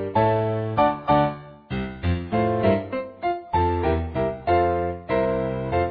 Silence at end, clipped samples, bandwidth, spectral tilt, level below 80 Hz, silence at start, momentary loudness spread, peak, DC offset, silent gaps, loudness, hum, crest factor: 0 s; under 0.1%; 5.2 kHz; -10.5 dB/octave; -40 dBFS; 0 s; 7 LU; -6 dBFS; under 0.1%; none; -23 LUFS; none; 16 dB